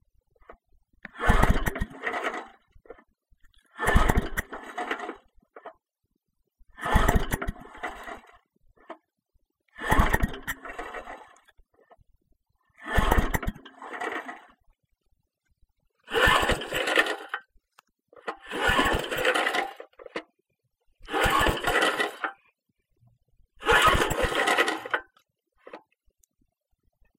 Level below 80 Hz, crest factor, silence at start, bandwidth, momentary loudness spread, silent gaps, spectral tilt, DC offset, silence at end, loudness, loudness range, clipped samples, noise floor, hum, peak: -34 dBFS; 26 dB; 1.15 s; 16.5 kHz; 22 LU; none; -4 dB/octave; under 0.1%; 1.4 s; -26 LUFS; 6 LU; under 0.1%; -79 dBFS; none; -4 dBFS